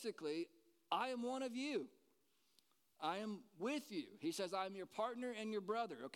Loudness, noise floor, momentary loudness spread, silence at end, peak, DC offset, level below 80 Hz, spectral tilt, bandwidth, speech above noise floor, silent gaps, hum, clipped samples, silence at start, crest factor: -45 LUFS; -80 dBFS; 5 LU; 0.05 s; -24 dBFS; under 0.1%; under -90 dBFS; -4 dB/octave; 17.5 kHz; 36 dB; none; none; under 0.1%; 0 s; 22 dB